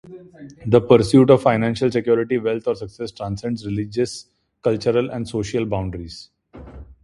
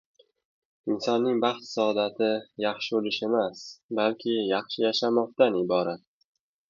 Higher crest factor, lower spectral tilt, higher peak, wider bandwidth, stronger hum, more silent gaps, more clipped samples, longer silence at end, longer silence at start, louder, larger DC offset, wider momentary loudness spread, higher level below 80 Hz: about the same, 20 dB vs 20 dB; first, -7 dB/octave vs -5 dB/octave; first, 0 dBFS vs -6 dBFS; first, 11.5 kHz vs 7.4 kHz; neither; second, none vs 3.83-3.89 s; neither; second, 0.2 s vs 0.7 s; second, 0.05 s vs 0.85 s; first, -19 LUFS vs -27 LUFS; neither; first, 19 LU vs 9 LU; first, -46 dBFS vs -74 dBFS